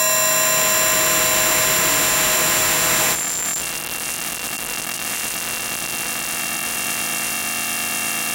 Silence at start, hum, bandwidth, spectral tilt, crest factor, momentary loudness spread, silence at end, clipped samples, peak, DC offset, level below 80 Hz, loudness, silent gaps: 0 s; none; 17.5 kHz; 0 dB/octave; 16 dB; 9 LU; 0 s; under 0.1%; -4 dBFS; under 0.1%; -48 dBFS; -18 LUFS; none